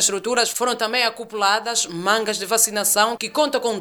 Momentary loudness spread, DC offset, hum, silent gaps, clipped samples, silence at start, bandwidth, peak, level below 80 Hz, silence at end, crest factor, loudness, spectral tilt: 4 LU; under 0.1%; none; none; under 0.1%; 0 s; 20 kHz; -2 dBFS; -68 dBFS; 0 s; 18 dB; -19 LUFS; -0.5 dB/octave